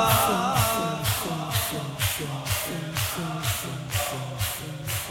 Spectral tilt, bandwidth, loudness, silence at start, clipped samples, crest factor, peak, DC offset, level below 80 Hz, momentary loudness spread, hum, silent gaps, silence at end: -3.5 dB/octave; 17.5 kHz; -26 LUFS; 0 s; under 0.1%; 18 dB; -8 dBFS; under 0.1%; -46 dBFS; 7 LU; none; none; 0 s